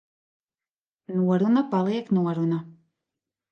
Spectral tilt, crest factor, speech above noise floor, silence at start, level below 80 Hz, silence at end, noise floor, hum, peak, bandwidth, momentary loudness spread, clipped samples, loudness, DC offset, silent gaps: -9.5 dB/octave; 14 dB; over 67 dB; 1.1 s; -74 dBFS; 0.8 s; under -90 dBFS; none; -12 dBFS; 6.6 kHz; 7 LU; under 0.1%; -24 LUFS; under 0.1%; none